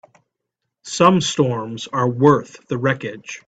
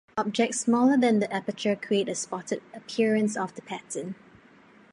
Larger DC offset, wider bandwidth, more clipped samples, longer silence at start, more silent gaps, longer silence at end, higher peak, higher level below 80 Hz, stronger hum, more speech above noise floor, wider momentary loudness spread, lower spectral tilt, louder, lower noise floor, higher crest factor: neither; second, 9.2 kHz vs 11.5 kHz; neither; first, 0.85 s vs 0.15 s; neither; second, 0.1 s vs 0.8 s; first, 0 dBFS vs -10 dBFS; first, -58 dBFS vs -74 dBFS; neither; first, 61 dB vs 29 dB; about the same, 13 LU vs 14 LU; about the same, -5.5 dB/octave vs -4.5 dB/octave; first, -18 LUFS vs -27 LUFS; first, -79 dBFS vs -55 dBFS; about the same, 20 dB vs 16 dB